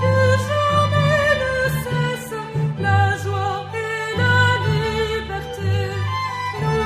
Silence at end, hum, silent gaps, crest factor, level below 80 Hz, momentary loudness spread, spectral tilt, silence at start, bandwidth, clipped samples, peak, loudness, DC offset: 0 s; 50 Hz at -30 dBFS; none; 16 dB; -40 dBFS; 8 LU; -5.5 dB/octave; 0 s; 15.5 kHz; under 0.1%; -4 dBFS; -20 LUFS; under 0.1%